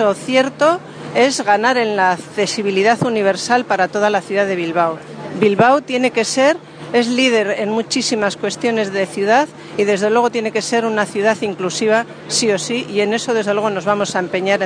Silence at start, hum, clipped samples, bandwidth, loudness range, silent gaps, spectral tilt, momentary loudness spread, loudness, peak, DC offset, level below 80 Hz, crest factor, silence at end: 0 s; none; under 0.1%; 10 kHz; 2 LU; none; -3.5 dB/octave; 6 LU; -16 LUFS; 0 dBFS; under 0.1%; -62 dBFS; 16 dB; 0 s